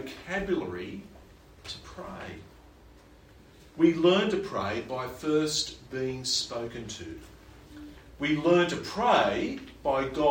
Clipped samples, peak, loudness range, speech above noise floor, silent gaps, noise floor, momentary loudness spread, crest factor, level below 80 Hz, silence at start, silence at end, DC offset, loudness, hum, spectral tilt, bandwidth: under 0.1%; -10 dBFS; 10 LU; 26 dB; none; -54 dBFS; 22 LU; 20 dB; -54 dBFS; 0 s; 0 s; under 0.1%; -28 LUFS; none; -4.5 dB/octave; 16.5 kHz